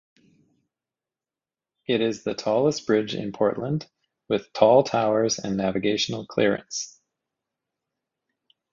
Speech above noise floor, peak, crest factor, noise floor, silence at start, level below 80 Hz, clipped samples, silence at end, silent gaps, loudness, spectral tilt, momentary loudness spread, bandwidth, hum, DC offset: over 67 dB; -2 dBFS; 24 dB; under -90 dBFS; 1.9 s; -62 dBFS; under 0.1%; 1.85 s; none; -24 LUFS; -4.5 dB/octave; 12 LU; 7.6 kHz; none; under 0.1%